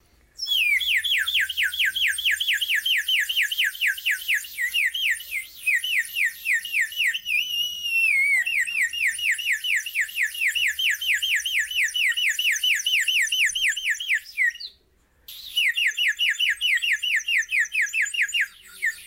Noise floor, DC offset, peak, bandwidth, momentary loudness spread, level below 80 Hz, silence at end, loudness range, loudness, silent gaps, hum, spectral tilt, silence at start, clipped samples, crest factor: -62 dBFS; under 0.1%; -12 dBFS; 16 kHz; 5 LU; -64 dBFS; 0 s; 2 LU; -21 LUFS; none; none; 5 dB/octave; 0.4 s; under 0.1%; 12 dB